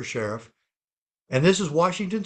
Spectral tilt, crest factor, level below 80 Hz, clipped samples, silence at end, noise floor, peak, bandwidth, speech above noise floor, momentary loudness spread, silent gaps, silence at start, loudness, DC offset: -5 dB/octave; 20 dB; -60 dBFS; under 0.1%; 0 s; under -90 dBFS; -6 dBFS; 9.2 kHz; over 67 dB; 11 LU; 0.76-1.07 s; 0 s; -23 LUFS; under 0.1%